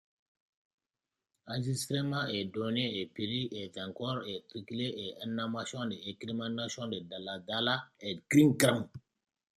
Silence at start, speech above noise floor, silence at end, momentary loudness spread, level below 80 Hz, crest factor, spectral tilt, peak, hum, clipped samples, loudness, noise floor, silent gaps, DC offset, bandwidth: 1.45 s; over 57 dB; 0.55 s; 13 LU; -72 dBFS; 26 dB; -5 dB/octave; -8 dBFS; none; under 0.1%; -34 LUFS; under -90 dBFS; none; under 0.1%; 15 kHz